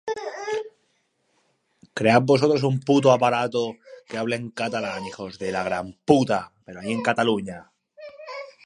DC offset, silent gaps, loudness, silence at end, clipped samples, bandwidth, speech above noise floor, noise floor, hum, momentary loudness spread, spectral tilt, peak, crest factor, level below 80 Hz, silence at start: under 0.1%; none; -23 LUFS; 0.15 s; under 0.1%; 11 kHz; 47 dB; -69 dBFS; none; 19 LU; -6 dB/octave; -2 dBFS; 22 dB; -62 dBFS; 0.05 s